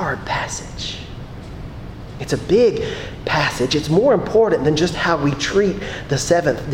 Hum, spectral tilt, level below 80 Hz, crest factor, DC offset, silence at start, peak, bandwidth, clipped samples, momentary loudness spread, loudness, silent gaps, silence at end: none; -5 dB/octave; -38 dBFS; 16 dB; under 0.1%; 0 s; -2 dBFS; 16 kHz; under 0.1%; 18 LU; -18 LUFS; none; 0 s